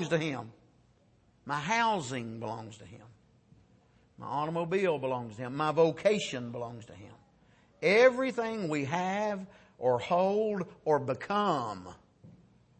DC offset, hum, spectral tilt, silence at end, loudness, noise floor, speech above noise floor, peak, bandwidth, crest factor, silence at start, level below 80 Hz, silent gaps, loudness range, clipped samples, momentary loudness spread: under 0.1%; none; -5.5 dB/octave; 0.5 s; -30 LUFS; -66 dBFS; 35 dB; -12 dBFS; 8.8 kHz; 20 dB; 0 s; -70 dBFS; none; 7 LU; under 0.1%; 17 LU